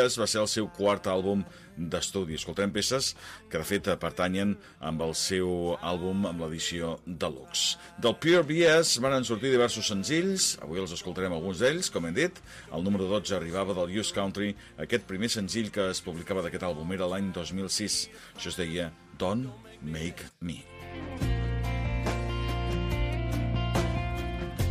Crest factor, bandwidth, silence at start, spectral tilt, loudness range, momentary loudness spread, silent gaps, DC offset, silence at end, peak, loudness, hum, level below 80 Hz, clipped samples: 18 dB; 15.5 kHz; 0 s; -4 dB/octave; 8 LU; 11 LU; none; under 0.1%; 0 s; -12 dBFS; -29 LUFS; none; -42 dBFS; under 0.1%